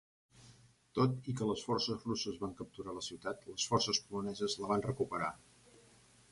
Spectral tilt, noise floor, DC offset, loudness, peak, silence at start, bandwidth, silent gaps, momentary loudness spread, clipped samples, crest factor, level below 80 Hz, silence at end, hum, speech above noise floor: -4.5 dB/octave; -64 dBFS; under 0.1%; -37 LUFS; -16 dBFS; 0.35 s; 11.5 kHz; none; 10 LU; under 0.1%; 22 dB; -66 dBFS; 0.95 s; none; 27 dB